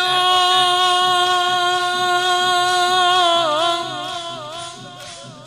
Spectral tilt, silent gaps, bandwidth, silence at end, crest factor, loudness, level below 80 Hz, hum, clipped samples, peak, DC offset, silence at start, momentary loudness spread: -1.5 dB/octave; none; 15.5 kHz; 0 s; 16 dB; -16 LUFS; -66 dBFS; none; under 0.1%; -2 dBFS; under 0.1%; 0 s; 17 LU